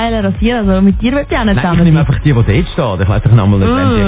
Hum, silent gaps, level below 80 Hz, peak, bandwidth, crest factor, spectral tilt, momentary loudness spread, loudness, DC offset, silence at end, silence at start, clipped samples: none; none; -20 dBFS; 0 dBFS; 4 kHz; 10 dB; -11.5 dB/octave; 4 LU; -11 LUFS; under 0.1%; 0 s; 0 s; 0.3%